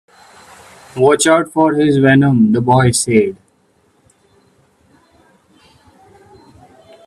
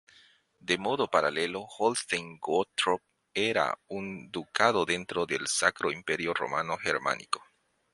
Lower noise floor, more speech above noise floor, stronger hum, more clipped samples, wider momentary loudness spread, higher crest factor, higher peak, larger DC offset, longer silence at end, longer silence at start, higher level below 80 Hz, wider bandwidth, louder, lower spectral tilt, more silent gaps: second, -56 dBFS vs -61 dBFS; first, 45 dB vs 32 dB; neither; neither; second, 5 LU vs 10 LU; second, 16 dB vs 24 dB; first, 0 dBFS vs -6 dBFS; neither; first, 3.7 s vs 0.55 s; first, 0.95 s vs 0.65 s; first, -50 dBFS vs -66 dBFS; first, 14.5 kHz vs 11.5 kHz; first, -12 LUFS vs -29 LUFS; first, -5.5 dB/octave vs -2.5 dB/octave; neither